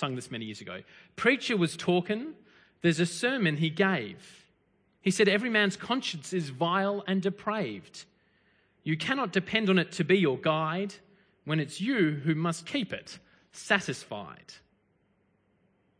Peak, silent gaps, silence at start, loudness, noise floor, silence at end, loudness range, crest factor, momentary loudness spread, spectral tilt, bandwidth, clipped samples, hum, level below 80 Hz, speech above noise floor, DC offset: -8 dBFS; none; 0 s; -29 LUFS; -70 dBFS; 1.45 s; 4 LU; 22 dB; 18 LU; -5 dB/octave; 10.5 kHz; under 0.1%; none; -72 dBFS; 41 dB; under 0.1%